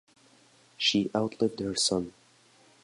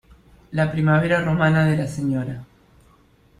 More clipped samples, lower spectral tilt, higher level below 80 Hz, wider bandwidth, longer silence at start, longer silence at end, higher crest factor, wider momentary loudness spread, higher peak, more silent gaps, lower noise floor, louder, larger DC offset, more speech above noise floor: neither; second, -3.5 dB/octave vs -7.5 dB/octave; second, -62 dBFS vs -48 dBFS; about the same, 11.5 kHz vs 11 kHz; first, 0.8 s vs 0.5 s; second, 0.75 s vs 0.95 s; about the same, 20 dB vs 16 dB; second, 6 LU vs 12 LU; second, -12 dBFS vs -6 dBFS; neither; first, -61 dBFS vs -55 dBFS; second, -28 LUFS vs -20 LUFS; neither; about the same, 33 dB vs 36 dB